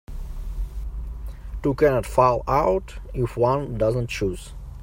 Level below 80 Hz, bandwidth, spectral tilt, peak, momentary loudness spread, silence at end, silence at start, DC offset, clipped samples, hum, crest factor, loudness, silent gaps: -34 dBFS; 16 kHz; -7 dB/octave; -4 dBFS; 17 LU; 0 s; 0.1 s; under 0.1%; under 0.1%; none; 20 dB; -23 LUFS; none